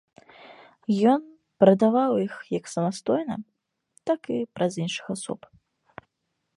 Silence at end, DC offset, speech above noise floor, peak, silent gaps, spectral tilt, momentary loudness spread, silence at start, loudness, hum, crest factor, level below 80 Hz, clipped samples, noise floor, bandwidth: 1.2 s; under 0.1%; 55 dB; -2 dBFS; none; -6.5 dB/octave; 15 LU; 0.45 s; -25 LUFS; none; 24 dB; -70 dBFS; under 0.1%; -79 dBFS; 11.5 kHz